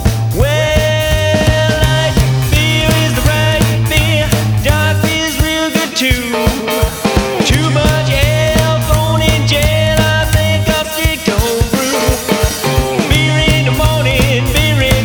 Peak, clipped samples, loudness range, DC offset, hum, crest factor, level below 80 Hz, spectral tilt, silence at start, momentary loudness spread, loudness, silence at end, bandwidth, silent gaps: 0 dBFS; under 0.1%; 1 LU; under 0.1%; none; 12 dB; -20 dBFS; -4.5 dB/octave; 0 s; 3 LU; -12 LUFS; 0 s; over 20 kHz; none